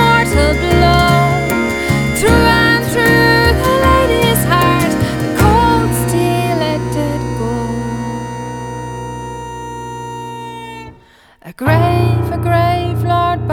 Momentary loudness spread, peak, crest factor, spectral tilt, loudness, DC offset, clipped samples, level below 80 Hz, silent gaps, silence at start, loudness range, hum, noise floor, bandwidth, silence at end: 16 LU; 0 dBFS; 14 dB; -5.5 dB/octave; -13 LUFS; under 0.1%; under 0.1%; -26 dBFS; none; 0 s; 13 LU; none; -45 dBFS; over 20 kHz; 0 s